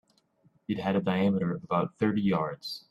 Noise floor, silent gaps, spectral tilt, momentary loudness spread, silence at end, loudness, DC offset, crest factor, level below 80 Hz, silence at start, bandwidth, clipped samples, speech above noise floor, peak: -67 dBFS; none; -8 dB/octave; 9 LU; 0.1 s; -29 LUFS; under 0.1%; 18 dB; -66 dBFS; 0.7 s; 12.5 kHz; under 0.1%; 39 dB; -12 dBFS